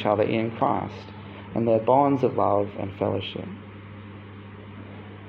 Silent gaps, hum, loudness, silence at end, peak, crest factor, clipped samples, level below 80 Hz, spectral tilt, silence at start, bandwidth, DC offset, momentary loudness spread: none; none; -24 LUFS; 0 s; -8 dBFS; 18 dB; under 0.1%; -62 dBFS; -9 dB/octave; 0 s; 6.6 kHz; under 0.1%; 22 LU